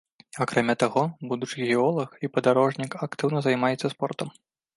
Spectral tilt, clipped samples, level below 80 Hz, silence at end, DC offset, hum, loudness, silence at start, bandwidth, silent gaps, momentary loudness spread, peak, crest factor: -6 dB/octave; under 0.1%; -70 dBFS; 0.45 s; under 0.1%; none; -25 LUFS; 0.35 s; 11.5 kHz; none; 9 LU; -6 dBFS; 20 dB